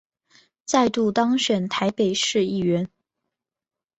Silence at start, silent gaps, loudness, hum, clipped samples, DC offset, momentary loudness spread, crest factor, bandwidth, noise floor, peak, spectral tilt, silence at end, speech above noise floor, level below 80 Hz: 0.7 s; none; -22 LUFS; none; under 0.1%; under 0.1%; 5 LU; 20 dB; 8.2 kHz; -90 dBFS; -4 dBFS; -4.5 dB/octave; 1.15 s; 68 dB; -62 dBFS